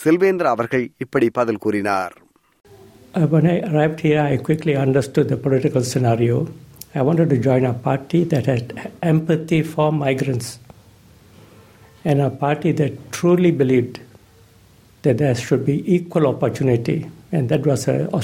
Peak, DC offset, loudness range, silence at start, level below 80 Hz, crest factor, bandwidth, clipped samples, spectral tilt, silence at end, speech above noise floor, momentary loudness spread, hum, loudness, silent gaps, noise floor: -4 dBFS; under 0.1%; 4 LU; 0 s; -54 dBFS; 16 dB; 15.5 kHz; under 0.1%; -7.5 dB/octave; 0 s; 32 dB; 8 LU; none; -19 LUFS; none; -50 dBFS